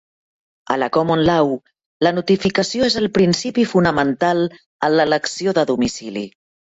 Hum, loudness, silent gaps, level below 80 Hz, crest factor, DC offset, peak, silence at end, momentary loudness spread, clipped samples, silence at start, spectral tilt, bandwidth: none; -18 LUFS; 1.86-2.00 s, 4.66-4.79 s; -50 dBFS; 16 dB; under 0.1%; -2 dBFS; 0.45 s; 8 LU; under 0.1%; 0.7 s; -5 dB/octave; 8.2 kHz